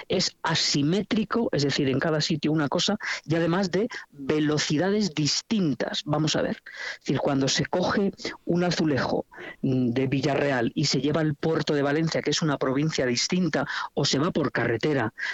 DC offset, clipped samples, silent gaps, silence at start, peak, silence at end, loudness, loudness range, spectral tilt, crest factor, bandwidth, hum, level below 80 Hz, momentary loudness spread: under 0.1%; under 0.1%; none; 0 s; -10 dBFS; 0 s; -25 LUFS; 1 LU; -4.5 dB/octave; 16 dB; 8.2 kHz; none; -58 dBFS; 5 LU